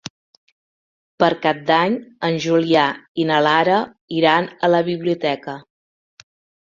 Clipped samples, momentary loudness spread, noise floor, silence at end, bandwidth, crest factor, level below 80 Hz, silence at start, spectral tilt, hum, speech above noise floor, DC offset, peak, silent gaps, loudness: under 0.1%; 9 LU; under -90 dBFS; 1.05 s; 7.6 kHz; 18 dB; -64 dBFS; 1.2 s; -5.5 dB/octave; none; over 72 dB; under 0.1%; -2 dBFS; 3.08-3.15 s, 4.01-4.08 s; -18 LUFS